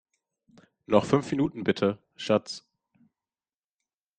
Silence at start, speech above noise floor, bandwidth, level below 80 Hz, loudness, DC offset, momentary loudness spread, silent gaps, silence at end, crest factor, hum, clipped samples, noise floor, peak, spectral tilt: 0.9 s; over 64 dB; 9.4 kHz; -64 dBFS; -27 LUFS; under 0.1%; 14 LU; none; 1.6 s; 24 dB; none; under 0.1%; under -90 dBFS; -6 dBFS; -6 dB/octave